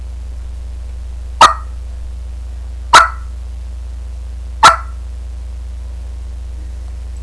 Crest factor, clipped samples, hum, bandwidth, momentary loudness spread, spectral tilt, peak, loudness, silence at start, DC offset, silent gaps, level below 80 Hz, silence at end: 16 dB; 0.3%; none; 11 kHz; 19 LU; -2 dB/octave; 0 dBFS; -10 LUFS; 0 s; 0.4%; none; -24 dBFS; 0 s